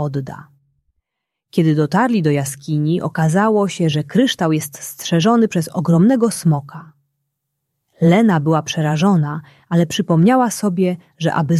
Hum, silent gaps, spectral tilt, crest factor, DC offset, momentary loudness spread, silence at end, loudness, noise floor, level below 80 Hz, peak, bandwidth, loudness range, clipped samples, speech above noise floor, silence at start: none; none; -6 dB/octave; 14 dB; under 0.1%; 10 LU; 0 s; -16 LUFS; -80 dBFS; -58 dBFS; -2 dBFS; 14 kHz; 2 LU; under 0.1%; 64 dB; 0 s